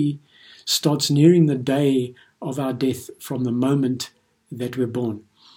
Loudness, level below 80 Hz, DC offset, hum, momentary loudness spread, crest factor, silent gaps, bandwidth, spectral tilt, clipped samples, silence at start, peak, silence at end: -21 LUFS; -64 dBFS; under 0.1%; none; 18 LU; 18 dB; none; 17.5 kHz; -6 dB/octave; under 0.1%; 0 s; -2 dBFS; 0.35 s